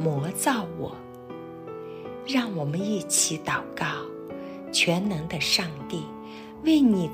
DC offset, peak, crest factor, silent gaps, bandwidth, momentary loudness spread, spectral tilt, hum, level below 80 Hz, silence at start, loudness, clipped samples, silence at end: under 0.1%; -8 dBFS; 18 dB; none; 16 kHz; 17 LU; -3.5 dB/octave; none; -58 dBFS; 0 s; -25 LUFS; under 0.1%; 0 s